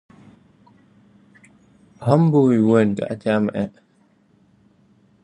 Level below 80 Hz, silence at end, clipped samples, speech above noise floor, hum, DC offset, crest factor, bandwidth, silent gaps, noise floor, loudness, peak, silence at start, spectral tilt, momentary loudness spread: -60 dBFS; 1.55 s; under 0.1%; 41 dB; none; under 0.1%; 20 dB; 10.5 kHz; none; -59 dBFS; -19 LUFS; 0 dBFS; 2 s; -9 dB/octave; 12 LU